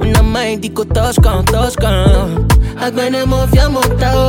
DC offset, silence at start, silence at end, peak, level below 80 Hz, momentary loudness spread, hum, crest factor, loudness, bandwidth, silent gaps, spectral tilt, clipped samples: under 0.1%; 0 s; 0 s; 0 dBFS; -16 dBFS; 5 LU; none; 12 dB; -13 LUFS; 17 kHz; none; -5.5 dB/octave; under 0.1%